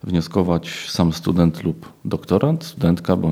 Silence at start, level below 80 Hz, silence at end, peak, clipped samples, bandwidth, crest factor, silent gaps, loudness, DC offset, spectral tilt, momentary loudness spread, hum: 0.05 s; -42 dBFS; 0 s; -2 dBFS; under 0.1%; 15 kHz; 18 dB; none; -20 LUFS; under 0.1%; -7 dB/octave; 9 LU; none